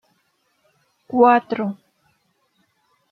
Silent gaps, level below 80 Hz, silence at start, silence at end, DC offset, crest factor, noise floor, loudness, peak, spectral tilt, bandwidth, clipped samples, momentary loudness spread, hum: none; -70 dBFS; 1.1 s; 1.4 s; under 0.1%; 20 dB; -67 dBFS; -18 LUFS; -2 dBFS; -8 dB/octave; 5.6 kHz; under 0.1%; 15 LU; none